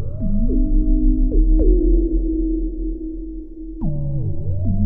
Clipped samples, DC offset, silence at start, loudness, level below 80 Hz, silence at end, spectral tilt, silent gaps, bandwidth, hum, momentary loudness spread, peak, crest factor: under 0.1%; 1%; 0 s; -21 LUFS; -18 dBFS; 0 s; -15.5 dB/octave; none; 1 kHz; none; 12 LU; -4 dBFS; 14 dB